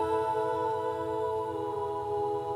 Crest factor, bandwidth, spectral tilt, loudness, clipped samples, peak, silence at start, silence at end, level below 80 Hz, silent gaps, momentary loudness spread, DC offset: 12 dB; 15 kHz; -6.5 dB/octave; -32 LUFS; under 0.1%; -18 dBFS; 0 s; 0 s; -66 dBFS; none; 4 LU; under 0.1%